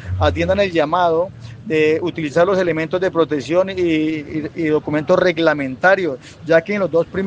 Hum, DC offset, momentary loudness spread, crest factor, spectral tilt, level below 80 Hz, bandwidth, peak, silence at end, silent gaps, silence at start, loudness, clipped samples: none; under 0.1%; 7 LU; 16 dB; -6.5 dB/octave; -48 dBFS; 8.8 kHz; 0 dBFS; 0 s; none; 0 s; -17 LUFS; under 0.1%